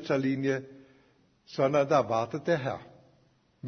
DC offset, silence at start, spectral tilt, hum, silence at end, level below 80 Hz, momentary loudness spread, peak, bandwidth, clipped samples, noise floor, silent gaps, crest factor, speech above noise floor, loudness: under 0.1%; 0 s; -6.5 dB/octave; none; 0 s; -70 dBFS; 11 LU; -12 dBFS; 6.6 kHz; under 0.1%; -66 dBFS; none; 20 dB; 38 dB; -28 LUFS